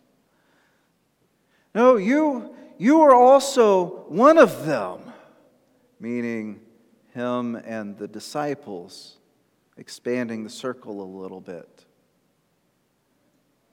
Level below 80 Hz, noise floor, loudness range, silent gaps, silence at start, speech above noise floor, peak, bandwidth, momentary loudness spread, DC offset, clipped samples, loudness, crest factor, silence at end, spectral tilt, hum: -78 dBFS; -68 dBFS; 16 LU; none; 1.75 s; 48 dB; -2 dBFS; 17.5 kHz; 24 LU; under 0.1%; under 0.1%; -20 LUFS; 22 dB; 2.1 s; -5.5 dB/octave; none